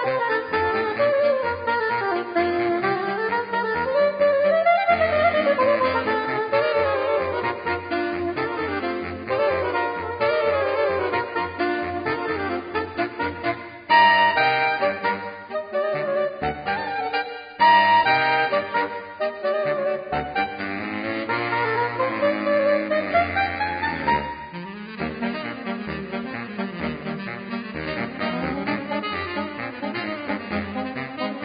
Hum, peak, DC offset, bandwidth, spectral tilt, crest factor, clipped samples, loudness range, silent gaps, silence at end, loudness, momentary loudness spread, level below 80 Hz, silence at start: none; -4 dBFS; under 0.1%; 5.2 kHz; -9.5 dB/octave; 18 dB; under 0.1%; 8 LU; none; 0 s; -23 LUFS; 11 LU; -50 dBFS; 0 s